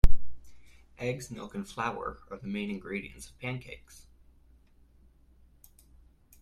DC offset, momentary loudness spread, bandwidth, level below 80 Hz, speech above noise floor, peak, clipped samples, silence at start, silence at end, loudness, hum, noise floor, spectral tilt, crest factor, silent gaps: under 0.1%; 24 LU; 11 kHz; -36 dBFS; 23 dB; -4 dBFS; under 0.1%; 0.05 s; 2.65 s; -37 LUFS; none; -60 dBFS; -6 dB/octave; 24 dB; none